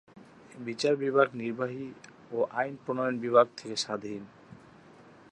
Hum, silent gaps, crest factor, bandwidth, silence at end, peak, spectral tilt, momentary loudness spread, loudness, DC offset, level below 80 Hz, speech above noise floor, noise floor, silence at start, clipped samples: none; none; 24 dB; 10.5 kHz; 0.75 s; -8 dBFS; -4.5 dB/octave; 18 LU; -29 LUFS; under 0.1%; -76 dBFS; 25 dB; -54 dBFS; 0.15 s; under 0.1%